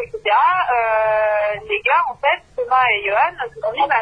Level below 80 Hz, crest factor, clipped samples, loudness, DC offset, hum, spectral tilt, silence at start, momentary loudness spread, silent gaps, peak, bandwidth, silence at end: -52 dBFS; 14 dB; under 0.1%; -17 LUFS; under 0.1%; none; -4 dB/octave; 0 s; 5 LU; none; -4 dBFS; 5.2 kHz; 0 s